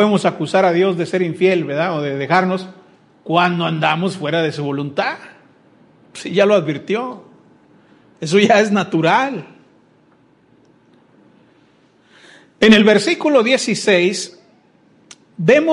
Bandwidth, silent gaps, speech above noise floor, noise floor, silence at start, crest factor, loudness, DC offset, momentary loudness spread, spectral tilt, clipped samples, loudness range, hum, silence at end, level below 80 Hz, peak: 11.5 kHz; none; 38 dB; -54 dBFS; 0 s; 18 dB; -16 LUFS; under 0.1%; 13 LU; -5 dB/octave; under 0.1%; 6 LU; none; 0 s; -62 dBFS; 0 dBFS